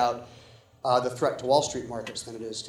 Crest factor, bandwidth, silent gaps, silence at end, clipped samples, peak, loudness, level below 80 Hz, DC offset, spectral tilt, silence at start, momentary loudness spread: 20 dB; over 20 kHz; none; 0 s; under 0.1%; -8 dBFS; -28 LUFS; -62 dBFS; under 0.1%; -4 dB/octave; 0 s; 12 LU